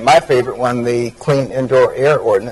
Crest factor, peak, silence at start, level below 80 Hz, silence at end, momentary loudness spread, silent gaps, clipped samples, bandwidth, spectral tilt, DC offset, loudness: 12 dB; 0 dBFS; 0 s; -46 dBFS; 0 s; 6 LU; none; under 0.1%; 12 kHz; -5.5 dB/octave; under 0.1%; -14 LUFS